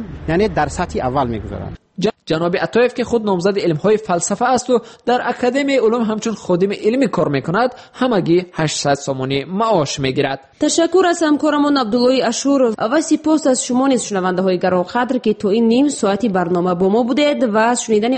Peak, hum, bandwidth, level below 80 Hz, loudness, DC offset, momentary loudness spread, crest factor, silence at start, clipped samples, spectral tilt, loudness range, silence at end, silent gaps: -4 dBFS; none; 8.8 kHz; -44 dBFS; -16 LUFS; under 0.1%; 5 LU; 12 dB; 0 s; under 0.1%; -5 dB/octave; 3 LU; 0 s; none